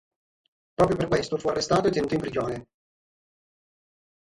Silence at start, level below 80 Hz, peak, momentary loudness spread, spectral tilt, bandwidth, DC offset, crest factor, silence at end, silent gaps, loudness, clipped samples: 0.8 s; -52 dBFS; -6 dBFS; 10 LU; -5.5 dB/octave; 11.5 kHz; under 0.1%; 22 dB; 1.6 s; none; -25 LUFS; under 0.1%